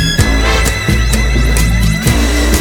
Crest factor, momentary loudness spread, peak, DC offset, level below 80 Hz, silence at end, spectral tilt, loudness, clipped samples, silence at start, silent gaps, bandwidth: 10 dB; 1 LU; 0 dBFS; under 0.1%; -14 dBFS; 0 s; -4.5 dB/octave; -12 LUFS; under 0.1%; 0 s; none; 19 kHz